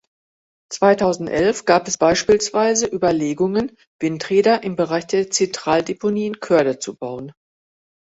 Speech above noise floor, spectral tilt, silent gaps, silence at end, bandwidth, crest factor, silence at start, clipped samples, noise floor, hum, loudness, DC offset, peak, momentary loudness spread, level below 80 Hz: over 72 dB; -4 dB/octave; 3.87-3.99 s; 0.7 s; 8.2 kHz; 18 dB; 0.7 s; under 0.1%; under -90 dBFS; none; -19 LUFS; under 0.1%; -2 dBFS; 11 LU; -54 dBFS